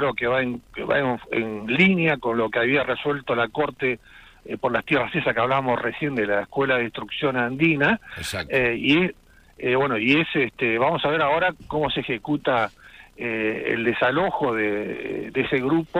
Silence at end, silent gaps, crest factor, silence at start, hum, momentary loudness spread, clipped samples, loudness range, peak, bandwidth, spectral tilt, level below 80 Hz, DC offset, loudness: 0 s; none; 18 dB; 0 s; none; 9 LU; under 0.1%; 2 LU; -4 dBFS; 15.5 kHz; -6 dB/octave; -52 dBFS; under 0.1%; -23 LUFS